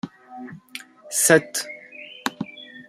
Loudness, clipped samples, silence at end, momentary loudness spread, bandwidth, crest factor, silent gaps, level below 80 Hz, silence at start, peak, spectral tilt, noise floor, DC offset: -21 LUFS; under 0.1%; 0.05 s; 23 LU; 16 kHz; 24 dB; none; -68 dBFS; 0.05 s; -2 dBFS; -2.5 dB/octave; -42 dBFS; under 0.1%